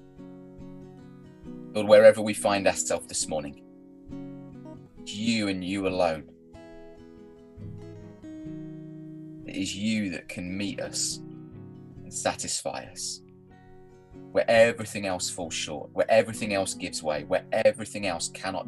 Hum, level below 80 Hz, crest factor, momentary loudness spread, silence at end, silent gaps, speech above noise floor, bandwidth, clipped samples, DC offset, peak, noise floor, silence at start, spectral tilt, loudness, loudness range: none; -58 dBFS; 24 dB; 22 LU; 0 s; none; 26 dB; 12.5 kHz; under 0.1%; under 0.1%; -4 dBFS; -51 dBFS; 0.05 s; -3.5 dB/octave; -26 LUFS; 11 LU